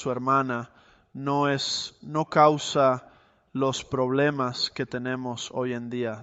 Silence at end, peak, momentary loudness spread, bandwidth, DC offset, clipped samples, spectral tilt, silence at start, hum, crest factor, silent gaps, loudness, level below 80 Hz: 0 s; -6 dBFS; 12 LU; 8.2 kHz; under 0.1%; under 0.1%; -5 dB/octave; 0 s; none; 20 dB; none; -26 LUFS; -64 dBFS